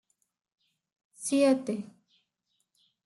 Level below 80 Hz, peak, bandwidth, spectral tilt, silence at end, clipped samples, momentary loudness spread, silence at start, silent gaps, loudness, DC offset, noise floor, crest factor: -84 dBFS; -14 dBFS; 12 kHz; -4.5 dB/octave; 1.25 s; under 0.1%; 14 LU; 1.2 s; none; -28 LUFS; under 0.1%; -79 dBFS; 20 dB